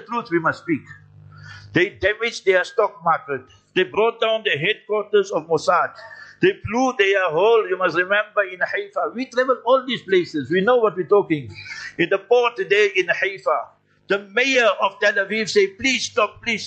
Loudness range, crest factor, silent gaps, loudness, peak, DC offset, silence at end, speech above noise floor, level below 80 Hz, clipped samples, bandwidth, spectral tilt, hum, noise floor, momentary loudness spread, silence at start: 2 LU; 16 dB; none; -20 LUFS; -4 dBFS; under 0.1%; 0 s; 22 dB; -58 dBFS; under 0.1%; 8.8 kHz; -4 dB/octave; none; -42 dBFS; 8 LU; 0 s